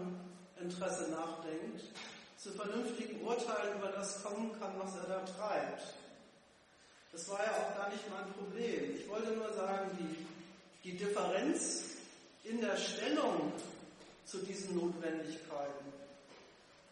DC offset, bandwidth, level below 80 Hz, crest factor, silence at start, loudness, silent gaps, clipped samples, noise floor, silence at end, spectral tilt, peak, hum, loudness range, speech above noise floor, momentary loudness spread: under 0.1%; 11.5 kHz; -82 dBFS; 20 dB; 0 s; -41 LUFS; none; under 0.1%; -66 dBFS; 0 s; -4 dB/octave; -22 dBFS; none; 5 LU; 26 dB; 17 LU